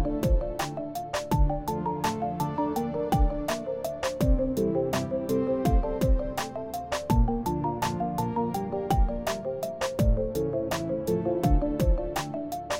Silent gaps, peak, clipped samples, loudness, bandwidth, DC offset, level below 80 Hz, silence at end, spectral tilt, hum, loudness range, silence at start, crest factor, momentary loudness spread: none; -12 dBFS; under 0.1%; -28 LUFS; 16.5 kHz; under 0.1%; -32 dBFS; 0 s; -6.5 dB/octave; none; 1 LU; 0 s; 14 dB; 6 LU